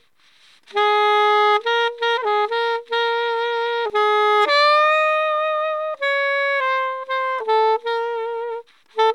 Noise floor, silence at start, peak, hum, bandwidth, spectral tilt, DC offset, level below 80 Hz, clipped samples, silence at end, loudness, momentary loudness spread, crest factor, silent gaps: -56 dBFS; 0.75 s; -6 dBFS; none; 11.5 kHz; 0 dB/octave; 0.1%; -80 dBFS; under 0.1%; 0 s; -19 LUFS; 8 LU; 14 dB; none